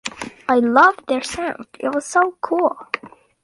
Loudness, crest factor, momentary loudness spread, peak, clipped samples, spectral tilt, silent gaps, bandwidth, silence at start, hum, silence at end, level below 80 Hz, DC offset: -19 LUFS; 18 dB; 15 LU; 0 dBFS; under 0.1%; -3 dB/octave; none; 11.5 kHz; 0.05 s; none; 0.35 s; -56 dBFS; under 0.1%